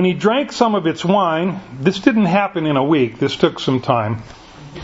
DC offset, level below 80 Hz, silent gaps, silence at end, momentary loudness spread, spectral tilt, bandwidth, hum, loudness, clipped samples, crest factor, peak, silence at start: under 0.1%; -52 dBFS; none; 0 s; 5 LU; -6.5 dB/octave; 8 kHz; none; -17 LUFS; under 0.1%; 16 dB; 0 dBFS; 0 s